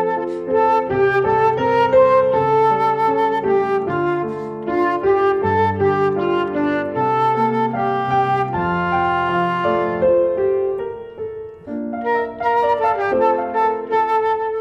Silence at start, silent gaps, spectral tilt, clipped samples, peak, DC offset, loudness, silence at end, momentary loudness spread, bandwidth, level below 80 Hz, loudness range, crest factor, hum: 0 s; none; -8 dB/octave; under 0.1%; -4 dBFS; under 0.1%; -18 LUFS; 0 s; 7 LU; 7.4 kHz; -50 dBFS; 4 LU; 14 dB; none